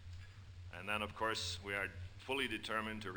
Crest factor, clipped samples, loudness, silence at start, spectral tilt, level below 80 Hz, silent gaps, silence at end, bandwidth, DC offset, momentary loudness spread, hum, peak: 18 dB; under 0.1%; -40 LUFS; 0 s; -3.5 dB/octave; -62 dBFS; none; 0 s; over 20 kHz; under 0.1%; 16 LU; none; -24 dBFS